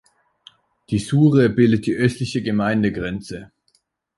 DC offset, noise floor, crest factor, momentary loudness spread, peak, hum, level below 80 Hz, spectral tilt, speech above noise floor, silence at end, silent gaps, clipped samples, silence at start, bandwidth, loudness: under 0.1%; -65 dBFS; 16 dB; 14 LU; -4 dBFS; none; -48 dBFS; -7 dB/octave; 47 dB; 0.7 s; none; under 0.1%; 0.9 s; 11.5 kHz; -19 LUFS